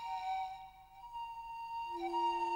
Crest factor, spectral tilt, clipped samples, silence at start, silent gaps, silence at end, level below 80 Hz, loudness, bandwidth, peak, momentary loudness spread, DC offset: 14 dB; -3.5 dB/octave; under 0.1%; 0 s; none; 0 s; -68 dBFS; -41 LUFS; 16.5 kHz; -26 dBFS; 16 LU; under 0.1%